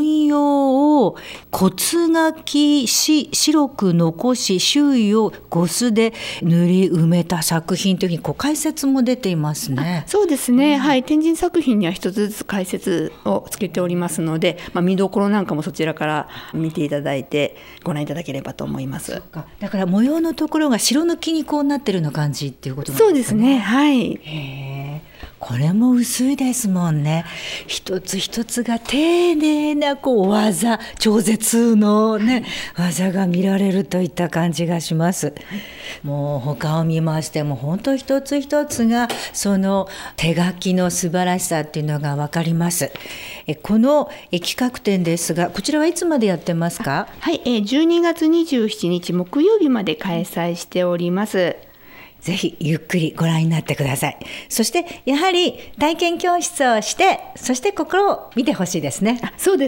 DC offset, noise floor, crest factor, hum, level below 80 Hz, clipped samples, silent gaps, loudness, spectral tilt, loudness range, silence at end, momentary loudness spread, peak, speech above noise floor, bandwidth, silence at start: under 0.1%; -43 dBFS; 16 dB; none; -50 dBFS; under 0.1%; none; -19 LUFS; -5 dB/octave; 5 LU; 0 s; 10 LU; -4 dBFS; 24 dB; 16.5 kHz; 0 s